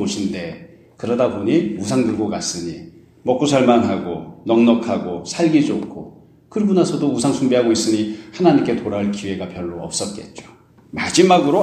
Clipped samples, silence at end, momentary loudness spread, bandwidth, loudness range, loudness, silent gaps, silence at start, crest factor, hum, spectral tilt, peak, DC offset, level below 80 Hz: under 0.1%; 0 s; 14 LU; 12.5 kHz; 3 LU; -18 LUFS; none; 0 s; 18 dB; none; -5 dB/octave; 0 dBFS; under 0.1%; -54 dBFS